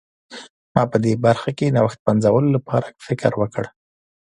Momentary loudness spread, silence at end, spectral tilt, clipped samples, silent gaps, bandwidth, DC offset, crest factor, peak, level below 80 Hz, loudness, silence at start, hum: 19 LU; 0.6 s; -7.5 dB/octave; under 0.1%; 0.50-0.75 s, 1.99-2.06 s; 11 kHz; under 0.1%; 20 dB; 0 dBFS; -52 dBFS; -19 LUFS; 0.3 s; none